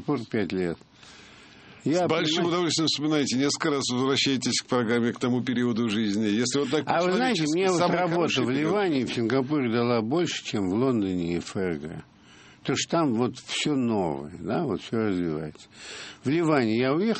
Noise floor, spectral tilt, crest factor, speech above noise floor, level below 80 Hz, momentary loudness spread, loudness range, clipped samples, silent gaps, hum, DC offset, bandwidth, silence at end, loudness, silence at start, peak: -52 dBFS; -4.5 dB/octave; 18 dB; 27 dB; -62 dBFS; 8 LU; 4 LU; under 0.1%; none; none; under 0.1%; 8.8 kHz; 0 s; -25 LUFS; 0 s; -8 dBFS